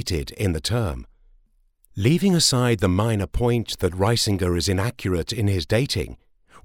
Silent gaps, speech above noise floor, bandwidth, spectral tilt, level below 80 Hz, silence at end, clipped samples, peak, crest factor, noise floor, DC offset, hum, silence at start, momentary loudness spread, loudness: none; 39 dB; 17 kHz; -5 dB/octave; -38 dBFS; 0.05 s; under 0.1%; -6 dBFS; 16 dB; -61 dBFS; under 0.1%; none; 0 s; 9 LU; -22 LUFS